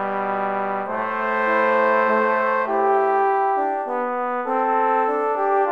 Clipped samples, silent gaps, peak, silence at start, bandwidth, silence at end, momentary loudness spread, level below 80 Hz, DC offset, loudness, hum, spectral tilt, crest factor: under 0.1%; none; -6 dBFS; 0 s; 7 kHz; 0 s; 6 LU; -74 dBFS; under 0.1%; -20 LUFS; none; -6.5 dB/octave; 14 dB